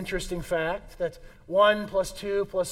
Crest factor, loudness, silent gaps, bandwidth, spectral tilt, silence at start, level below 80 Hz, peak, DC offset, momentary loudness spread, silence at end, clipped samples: 18 dB; -27 LUFS; none; 16 kHz; -4 dB/octave; 0 s; -46 dBFS; -8 dBFS; under 0.1%; 12 LU; 0 s; under 0.1%